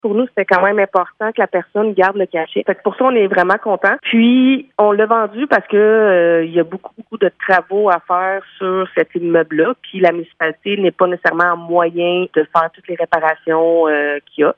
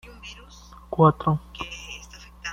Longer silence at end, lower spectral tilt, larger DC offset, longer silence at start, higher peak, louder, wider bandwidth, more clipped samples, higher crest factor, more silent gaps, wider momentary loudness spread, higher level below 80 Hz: about the same, 0.05 s vs 0 s; about the same, -7.5 dB/octave vs -6.5 dB/octave; neither; second, 0.05 s vs 0.25 s; first, 0 dBFS vs -4 dBFS; first, -15 LUFS vs -23 LUFS; second, 5.8 kHz vs 7.4 kHz; neither; second, 14 dB vs 22 dB; neither; second, 7 LU vs 23 LU; second, -64 dBFS vs -48 dBFS